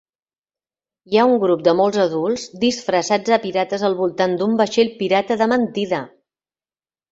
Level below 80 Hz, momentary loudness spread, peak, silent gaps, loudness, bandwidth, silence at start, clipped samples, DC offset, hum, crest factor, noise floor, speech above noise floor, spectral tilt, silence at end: -62 dBFS; 6 LU; -2 dBFS; none; -18 LUFS; 8 kHz; 1.1 s; under 0.1%; under 0.1%; none; 18 dB; under -90 dBFS; over 72 dB; -5 dB/octave; 1.05 s